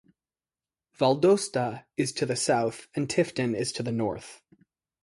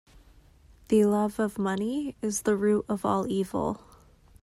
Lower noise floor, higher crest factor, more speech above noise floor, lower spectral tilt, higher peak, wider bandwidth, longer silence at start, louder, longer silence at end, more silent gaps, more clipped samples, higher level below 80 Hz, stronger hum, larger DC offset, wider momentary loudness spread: first, under -90 dBFS vs -56 dBFS; about the same, 18 dB vs 16 dB; first, over 63 dB vs 30 dB; about the same, -5 dB/octave vs -6 dB/octave; about the same, -10 dBFS vs -12 dBFS; second, 11.5 kHz vs 14.5 kHz; about the same, 1 s vs 0.9 s; about the same, -27 LUFS vs -27 LUFS; about the same, 0.7 s vs 0.65 s; neither; neither; second, -64 dBFS vs -56 dBFS; neither; neither; about the same, 9 LU vs 8 LU